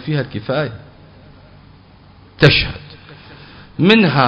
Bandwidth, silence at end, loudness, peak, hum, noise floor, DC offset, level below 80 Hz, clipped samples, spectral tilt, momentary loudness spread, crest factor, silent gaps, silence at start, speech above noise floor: 8 kHz; 0 s; -15 LUFS; 0 dBFS; none; -44 dBFS; under 0.1%; -40 dBFS; 0.1%; -7.5 dB/octave; 23 LU; 18 dB; none; 0 s; 30 dB